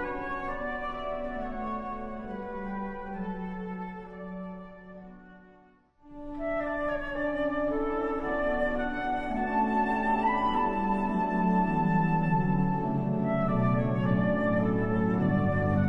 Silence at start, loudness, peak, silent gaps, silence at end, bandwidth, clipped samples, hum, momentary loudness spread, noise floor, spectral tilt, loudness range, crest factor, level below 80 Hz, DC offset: 0 s; -29 LUFS; -14 dBFS; none; 0 s; 5.6 kHz; under 0.1%; none; 13 LU; -60 dBFS; -9.5 dB/octave; 12 LU; 14 dB; -44 dBFS; under 0.1%